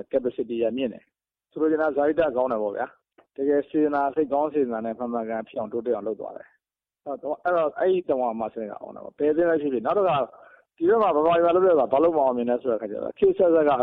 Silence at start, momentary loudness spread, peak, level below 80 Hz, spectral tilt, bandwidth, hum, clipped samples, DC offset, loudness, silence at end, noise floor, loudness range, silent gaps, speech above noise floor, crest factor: 0.15 s; 14 LU; -8 dBFS; -62 dBFS; -9.5 dB/octave; 4.3 kHz; none; under 0.1%; under 0.1%; -24 LUFS; 0 s; -79 dBFS; 6 LU; none; 55 dB; 16 dB